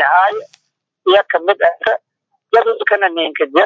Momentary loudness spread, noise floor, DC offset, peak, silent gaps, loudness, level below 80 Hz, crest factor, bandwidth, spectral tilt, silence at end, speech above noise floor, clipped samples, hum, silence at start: 7 LU; -66 dBFS; under 0.1%; 0 dBFS; none; -14 LUFS; -66 dBFS; 14 dB; 7.2 kHz; -4 dB/octave; 0 s; 52 dB; under 0.1%; none; 0 s